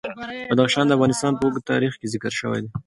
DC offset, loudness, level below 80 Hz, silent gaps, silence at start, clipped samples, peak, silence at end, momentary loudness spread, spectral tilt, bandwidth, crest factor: under 0.1%; -21 LUFS; -56 dBFS; none; 0.05 s; under 0.1%; -4 dBFS; 0.05 s; 10 LU; -5 dB/octave; 11.5 kHz; 18 dB